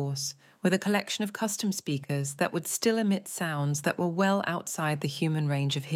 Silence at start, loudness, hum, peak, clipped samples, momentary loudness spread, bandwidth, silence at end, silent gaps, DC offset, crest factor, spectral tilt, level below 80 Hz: 0 s; -29 LUFS; none; -12 dBFS; under 0.1%; 6 LU; 16.5 kHz; 0 s; none; under 0.1%; 16 dB; -4.5 dB/octave; -78 dBFS